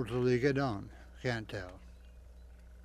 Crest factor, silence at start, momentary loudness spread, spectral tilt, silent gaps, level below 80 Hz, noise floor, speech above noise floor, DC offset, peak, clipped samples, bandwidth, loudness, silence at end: 20 dB; 0 s; 22 LU; -7 dB/octave; none; -54 dBFS; -53 dBFS; 20 dB; under 0.1%; -16 dBFS; under 0.1%; 13 kHz; -34 LUFS; 0 s